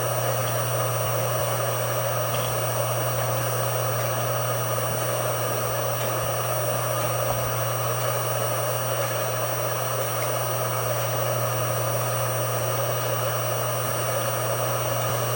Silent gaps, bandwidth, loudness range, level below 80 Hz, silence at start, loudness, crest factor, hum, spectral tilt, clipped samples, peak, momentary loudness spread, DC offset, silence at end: none; 17 kHz; 0 LU; -54 dBFS; 0 s; -24 LUFS; 14 dB; none; -3.5 dB/octave; under 0.1%; -12 dBFS; 1 LU; under 0.1%; 0 s